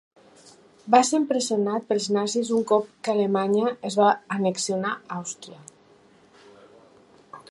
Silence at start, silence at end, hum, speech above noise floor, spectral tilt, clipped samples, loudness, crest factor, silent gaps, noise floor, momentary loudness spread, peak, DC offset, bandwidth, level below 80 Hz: 0.85 s; 0.1 s; none; 33 dB; -4.5 dB/octave; under 0.1%; -24 LUFS; 22 dB; none; -56 dBFS; 13 LU; -4 dBFS; under 0.1%; 11.5 kHz; -76 dBFS